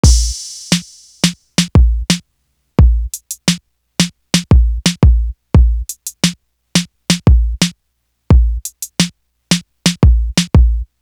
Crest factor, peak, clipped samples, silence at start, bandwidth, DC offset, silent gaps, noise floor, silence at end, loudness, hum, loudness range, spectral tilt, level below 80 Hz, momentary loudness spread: 14 dB; 0 dBFS; under 0.1%; 0.05 s; 15 kHz; under 0.1%; none; -67 dBFS; 0.15 s; -15 LUFS; none; 2 LU; -4.5 dB/octave; -16 dBFS; 8 LU